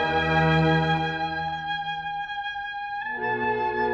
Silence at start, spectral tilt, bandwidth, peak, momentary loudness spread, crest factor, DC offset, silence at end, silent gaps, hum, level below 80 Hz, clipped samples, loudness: 0 s; -7 dB/octave; 7 kHz; -10 dBFS; 10 LU; 16 dB; under 0.1%; 0 s; none; none; -46 dBFS; under 0.1%; -25 LUFS